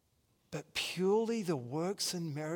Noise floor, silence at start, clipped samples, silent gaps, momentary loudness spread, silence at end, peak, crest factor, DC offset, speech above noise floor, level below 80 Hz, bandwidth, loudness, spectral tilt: -74 dBFS; 0.5 s; under 0.1%; none; 9 LU; 0 s; -20 dBFS; 16 dB; under 0.1%; 40 dB; -74 dBFS; 18 kHz; -35 LUFS; -4.5 dB/octave